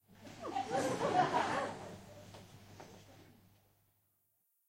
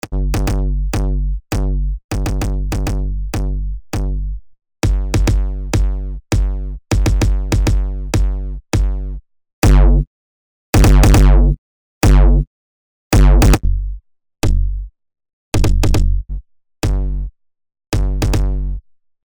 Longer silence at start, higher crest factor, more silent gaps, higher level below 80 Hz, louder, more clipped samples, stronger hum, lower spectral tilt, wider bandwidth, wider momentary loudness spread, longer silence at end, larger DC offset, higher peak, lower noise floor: about the same, 0.1 s vs 0.05 s; first, 22 dB vs 12 dB; second, none vs 2.04-2.09 s, 9.53-9.62 s, 10.07-10.73 s, 11.58-12.01 s, 12.47-13.11 s, 15.33-15.52 s; second, -74 dBFS vs -16 dBFS; second, -36 LUFS vs -17 LUFS; neither; neither; second, -4.5 dB/octave vs -6 dB/octave; second, 16 kHz vs over 20 kHz; first, 23 LU vs 15 LU; first, 1.45 s vs 0.25 s; neither; second, -20 dBFS vs -2 dBFS; second, -79 dBFS vs under -90 dBFS